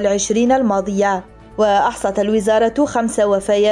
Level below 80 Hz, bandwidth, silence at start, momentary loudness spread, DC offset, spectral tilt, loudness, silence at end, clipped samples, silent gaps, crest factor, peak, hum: -44 dBFS; 11.5 kHz; 0 s; 4 LU; under 0.1%; -4.5 dB/octave; -16 LUFS; 0 s; under 0.1%; none; 10 dB; -6 dBFS; none